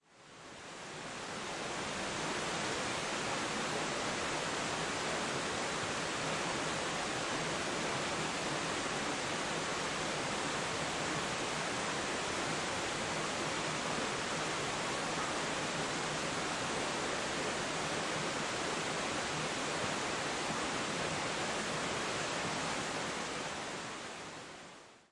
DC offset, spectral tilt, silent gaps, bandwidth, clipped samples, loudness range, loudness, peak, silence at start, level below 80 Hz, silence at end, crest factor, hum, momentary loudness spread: under 0.1%; -2.5 dB/octave; none; 11.5 kHz; under 0.1%; 1 LU; -36 LUFS; -22 dBFS; 0.15 s; -64 dBFS; 0.15 s; 16 dB; none; 5 LU